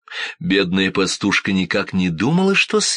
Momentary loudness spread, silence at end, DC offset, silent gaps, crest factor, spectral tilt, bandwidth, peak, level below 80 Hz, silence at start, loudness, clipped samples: 5 LU; 0 s; under 0.1%; none; 14 dB; -4 dB/octave; 10 kHz; -4 dBFS; -54 dBFS; 0.1 s; -18 LUFS; under 0.1%